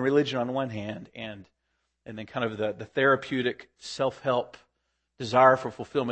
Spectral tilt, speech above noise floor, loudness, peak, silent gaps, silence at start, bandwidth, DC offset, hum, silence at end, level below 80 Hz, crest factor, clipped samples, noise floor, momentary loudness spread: -5.5 dB/octave; 51 dB; -27 LUFS; -6 dBFS; none; 0 s; 8.8 kHz; under 0.1%; none; 0 s; -68 dBFS; 22 dB; under 0.1%; -78 dBFS; 19 LU